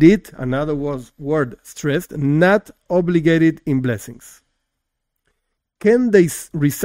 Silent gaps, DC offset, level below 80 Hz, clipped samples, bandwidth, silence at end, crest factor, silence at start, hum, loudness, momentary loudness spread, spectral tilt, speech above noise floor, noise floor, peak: none; under 0.1%; -46 dBFS; under 0.1%; 16 kHz; 0 s; 18 dB; 0 s; none; -18 LUFS; 12 LU; -6.5 dB/octave; 59 dB; -76 dBFS; 0 dBFS